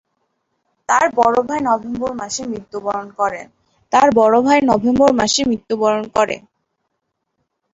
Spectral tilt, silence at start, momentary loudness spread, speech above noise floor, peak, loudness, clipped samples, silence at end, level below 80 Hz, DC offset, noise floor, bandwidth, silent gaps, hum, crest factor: -3.5 dB/octave; 0.9 s; 11 LU; 58 dB; -2 dBFS; -16 LUFS; under 0.1%; 1.35 s; -50 dBFS; under 0.1%; -74 dBFS; 8 kHz; none; none; 16 dB